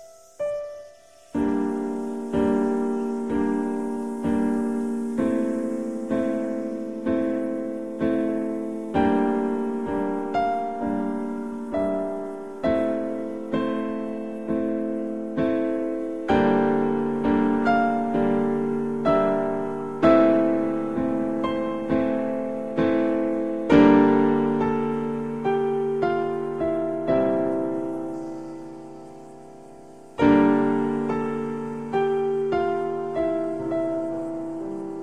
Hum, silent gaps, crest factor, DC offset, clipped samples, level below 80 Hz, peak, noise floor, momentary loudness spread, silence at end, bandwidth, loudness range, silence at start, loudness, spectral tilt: none; none; 20 dB; 0.4%; under 0.1%; -54 dBFS; -4 dBFS; -49 dBFS; 11 LU; 0 s; 11 kHz; 6 LU; 0 s; -24 LUFS; -7.5 dB/octave